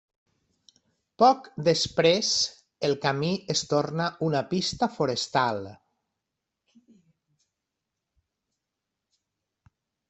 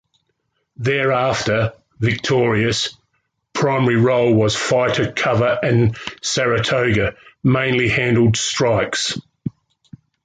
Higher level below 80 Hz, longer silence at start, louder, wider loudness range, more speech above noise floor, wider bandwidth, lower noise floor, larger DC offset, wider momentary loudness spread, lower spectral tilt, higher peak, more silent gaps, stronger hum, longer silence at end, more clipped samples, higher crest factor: second, -64 dBFS vs -46 dBFS; first, 1.2 s vs 0.8 s; second, -25 LUFS vs -18 LUFS; first, 8 LU vs 2 LU; first, 60 dB vs 53 dB; second, 8.4 kHz vs 9.4 kHz; first, -85 dBFS vs -70 dBFS; neither; about the same, 8 LU vs 9 LU; about the same, -4 dB/octave vs -5 dB/octave; about the same, -6 dBFS vs -4 dBFS; neither; neither; first, 4.35 s vs 0.75 s; neither; first, 22 dB vs 14 dB